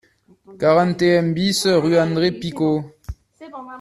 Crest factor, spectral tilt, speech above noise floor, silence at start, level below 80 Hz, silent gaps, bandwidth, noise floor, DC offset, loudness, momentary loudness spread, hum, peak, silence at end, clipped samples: 16 dB; -5.5 dB/octave; 20 dB; 0.5 s; -46 dBFS; none; 13.5 kHz; -38 dBFS; under 0.1%; -18 LUFS; 22 LU; none; -4 dBFS; 0 s; under 0.1%